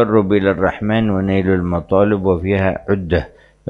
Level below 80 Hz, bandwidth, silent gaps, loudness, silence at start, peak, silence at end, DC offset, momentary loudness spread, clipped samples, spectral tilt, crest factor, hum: -40 dBFS; 5.2 kHz; none; -16 LUFS; 0 s; -2 dBFS; 0 s; under 0.1%; 6 LU; under 0.1%; -9.5 dB/octave; 14 dB; none